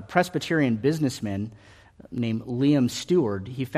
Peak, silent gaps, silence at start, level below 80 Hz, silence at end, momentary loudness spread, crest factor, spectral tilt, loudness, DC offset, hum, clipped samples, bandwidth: -4 dBFS; none; 0 s; -60 dBFS; 0 s; 9 LU; 20 dB; -6 dB/octave; -25 LUFS; under 0.1%; none; under 0.1%; 14.5 kHz